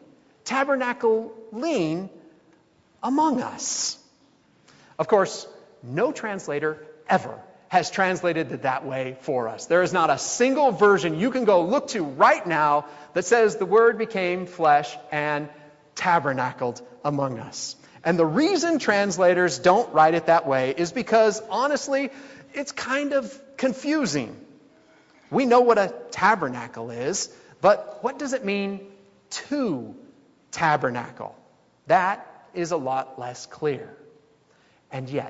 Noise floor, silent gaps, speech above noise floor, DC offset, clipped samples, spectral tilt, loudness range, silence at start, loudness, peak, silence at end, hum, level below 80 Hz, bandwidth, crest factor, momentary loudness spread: -60 dBFS; none; 37 dB; under 0.1%; under 0.1%; -4.5 dB/octave; 7 LU; 0.45 s; -23 LUFS; -4 dBFS; 0 s; none; -68 dBFS; 8 kHz; 20 dB; 16 LU